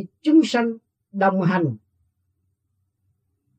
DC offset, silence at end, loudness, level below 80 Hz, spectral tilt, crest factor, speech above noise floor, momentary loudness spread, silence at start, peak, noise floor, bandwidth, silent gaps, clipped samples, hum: under 0.1%; 1.8 s; -20 LUFS; -76 dBFS; -7 dB/octave; 18 dB; 53 dB; 20 LU; 0 s; -6 dBFS; -73 dBFS; 8.6 kHz; none; under 0.1%; none